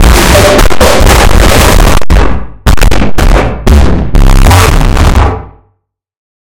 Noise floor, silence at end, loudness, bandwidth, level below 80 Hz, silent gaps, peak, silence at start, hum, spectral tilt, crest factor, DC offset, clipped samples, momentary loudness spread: -59 dBFS; 0.95 s; -6 LUFS; 19.5 kHz; -8 dBFS; none; 0 dBFS; 0 s; none; -4.5 dB/octave; 4 dB; under 0.1%; 7%; 6 LU